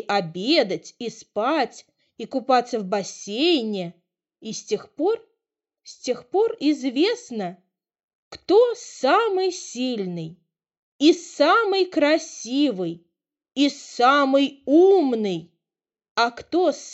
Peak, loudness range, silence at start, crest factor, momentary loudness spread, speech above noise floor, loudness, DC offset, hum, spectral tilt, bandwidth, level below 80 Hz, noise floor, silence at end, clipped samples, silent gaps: -4 dBFS; 6 LU; 0.1 s; 18 dB; 15 LU; 67 dB; -22 LUFS; under 0.1%; none; -4 dB/octave; 8.2 kHz; -72 dBFS; -89 dBFS; 0 s; under 0.1%; 8.04-8.09 s, 8.15-8.31 s, 10.77-10.99 s, 16.11-16.15 s